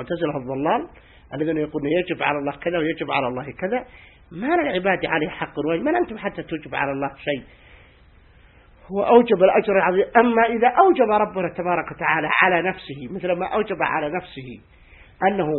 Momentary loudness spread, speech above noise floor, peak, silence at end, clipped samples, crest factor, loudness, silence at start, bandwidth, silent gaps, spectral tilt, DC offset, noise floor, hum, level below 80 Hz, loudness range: 13 LU; 30 dB; 0 dBFS; 0 s; under 0.1%; 22 dB; -21 LUFS; 0 s; 4.2 kHz; none; -10.5 dB/octave; under 0.1%; -51 dBFS; none; -52 dBFS; 7 LU